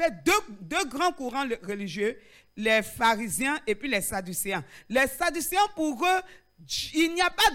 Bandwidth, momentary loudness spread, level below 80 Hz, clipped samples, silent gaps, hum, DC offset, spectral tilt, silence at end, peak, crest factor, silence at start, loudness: 17 kHz; 8 LU; -52 dBFS; under 0.1%; none; none; under 0.1%; -2.5 dB/octave; 0 s; -12 dBFS; 16 dB; 0 s; -27 LUFS